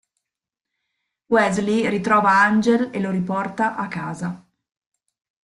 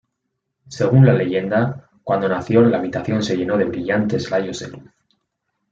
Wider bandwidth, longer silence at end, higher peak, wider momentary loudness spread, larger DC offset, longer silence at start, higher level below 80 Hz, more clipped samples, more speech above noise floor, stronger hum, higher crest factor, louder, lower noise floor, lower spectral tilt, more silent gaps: first, 11.5 kHz vs 7.6 kHz; first, 1.05 s vs 0.9 s; about the same, -4 dBFS vs -2 dBFS; about the same, 13 LU vs 14 LU; neither; first, 1.3 s vs 0.7 s; about the same, -60 dBFS vs -56 dBFS; neither; first, 66 dB vs 59 dB; neither; about the same, 18 dB vs 16 dB; about the same, -20 LUFS vs -18 LUFS; first, -86 dBFS vs -76 dBFS; second, -6 dB/octave vs -7.5 dB/octave; neither